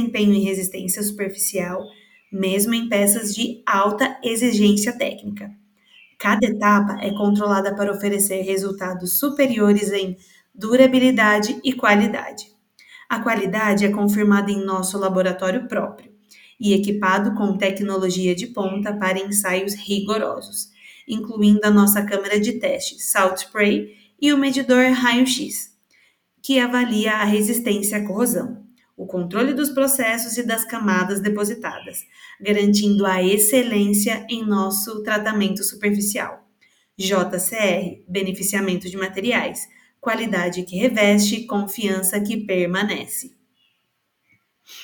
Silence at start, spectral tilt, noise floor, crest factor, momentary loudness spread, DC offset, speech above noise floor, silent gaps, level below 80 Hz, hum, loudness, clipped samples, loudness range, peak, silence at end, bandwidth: 0 s; -4 dB/octave; -71 dBFS; 20 dB; 12 LU; under 0.1%; 51 dB; none; -62 dBFS; none; -20 LUFS; under 0.1%; 4 LU; 0 dBFS; 0 s; over 20 kHz